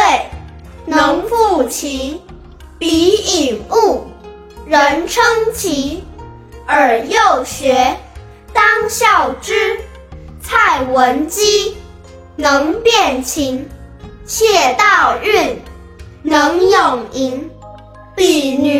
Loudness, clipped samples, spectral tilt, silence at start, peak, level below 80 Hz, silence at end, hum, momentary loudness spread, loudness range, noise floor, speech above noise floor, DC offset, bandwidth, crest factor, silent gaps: -13 LUFS; under 0.1%; -2.5 dB/octave; 0 s; 0 dBFS; -38 dBFS; 0 s; none; 17 LU; 3 LU; -36 dBFS; 23 dB; under 0.1%; 16.5 kHz; 14 dB; none